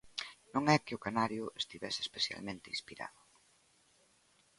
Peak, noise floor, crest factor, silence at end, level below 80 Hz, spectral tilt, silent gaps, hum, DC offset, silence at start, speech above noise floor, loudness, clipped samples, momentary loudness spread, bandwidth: -12 dBFS; -70 dBFS; 26 dB; 1.5 s; -72 dBFS; -4 dB/octave; none; none; under 0.1%; 0.05 s; 34 dB; -36 LUFS; under 0.1%; 13 LU; 11.5 kHz